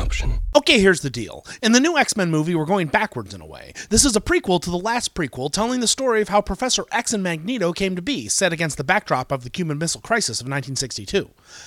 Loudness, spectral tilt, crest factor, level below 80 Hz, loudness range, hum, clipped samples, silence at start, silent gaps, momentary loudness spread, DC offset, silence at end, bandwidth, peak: -20 LUFS; -3.5 dB/octave; 20 dB; -34 dBFS; 3 LU; none; under 0.1%; 0 s; none; 11 LU; under 0.1%; 0 s; 16.5 kHz; 0 dBFS